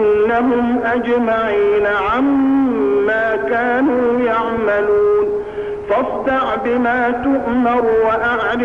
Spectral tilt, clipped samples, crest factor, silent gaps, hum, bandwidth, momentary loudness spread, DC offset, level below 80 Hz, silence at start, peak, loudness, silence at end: -7 dB/octave; under 0.1%; 10 dB; none; none; 6.4 kHz; 3 LU; 0.3%; -44 dBFS; 0 s; -6 dBFS; -16 LUFS; 0 s